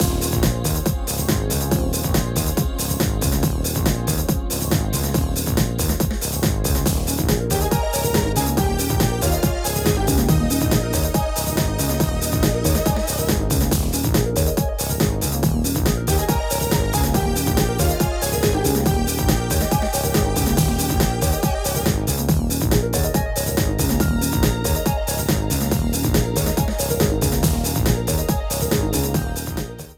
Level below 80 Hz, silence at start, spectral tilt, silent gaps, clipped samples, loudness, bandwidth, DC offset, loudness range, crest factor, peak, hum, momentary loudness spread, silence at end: -26 dBFS; 0 s; -5 dB/octave; none; under 0.1%; -20 LUFS; 17.5 kHz; under 0.1%; 2 LU; 16 dB; -2 dBFS; none; 2 LU; 0.05 s